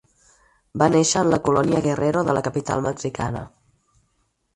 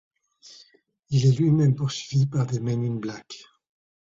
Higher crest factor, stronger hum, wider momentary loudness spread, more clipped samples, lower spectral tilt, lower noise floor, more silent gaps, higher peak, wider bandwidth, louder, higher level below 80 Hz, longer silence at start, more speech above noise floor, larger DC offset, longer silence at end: about the same, 20 dB vs 16 dB; neither; second, 11 LU vs 17 LU; neither; second, -5 dB/octave vs -7 dB/octave; first, -69 dBFS vs -60 dBFS; neither; first, -2 dBFS vs -10 dBFS; first, 11.5 kHz vs 7.6 kHz; first, -21 LUFS vs -24 LUFS; first, -50 dBFS vs -58 dBFS; first, 0.75 s vs 0.45 s; first, 49 dB vs 37 dB; neither; first, 1.05 s vs 0.7 s